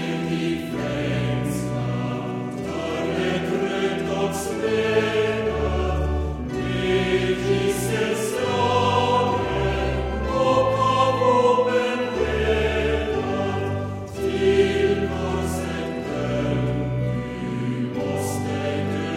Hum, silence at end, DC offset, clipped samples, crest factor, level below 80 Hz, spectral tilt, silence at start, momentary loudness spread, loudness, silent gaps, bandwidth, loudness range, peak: none; 0 s; under 0.1%; under 0.1%; 16 dB; -36 dBFS; -6 dB/octave; 0 s; 8 LU; -23 LUFS; none; 16 kHz; 5 LU; -6 dBFS